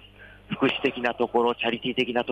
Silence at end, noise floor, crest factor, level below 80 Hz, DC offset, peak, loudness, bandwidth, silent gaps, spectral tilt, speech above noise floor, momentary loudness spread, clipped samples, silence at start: 0 s; -49 dBFS; 16 dB; -58 dBFS; under 0.1%; -10 dBFS; -25 LUFS; 9 kHz; none; -6 dB/octave; 24 dB; 3 LU; under 0.1%; 0.2 s